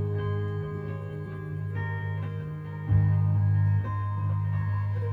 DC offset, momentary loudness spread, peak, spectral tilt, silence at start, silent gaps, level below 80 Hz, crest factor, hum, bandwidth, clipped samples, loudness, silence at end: under 0.1%; 11 LU; -14 dBFS; -10.5 dB/octave; 0 s; none; -48 dBFS; 14 dB; 50 Hz at -40 dBFS; 3.4 kHz; under 0.1%; -29 LUFS; 0 s